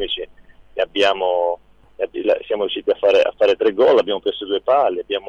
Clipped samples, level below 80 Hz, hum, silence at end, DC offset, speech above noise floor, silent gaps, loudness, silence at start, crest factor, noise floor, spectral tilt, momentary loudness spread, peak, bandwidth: under 0.1%; -52 dBFS; none; 0 s; under 0.1%; 28 dB; none; -18 LUFS; 0 s; 14 dB; -45 dBFS; -4 dB/octave; 12 LU; -4 dBFS; 7.6 kHz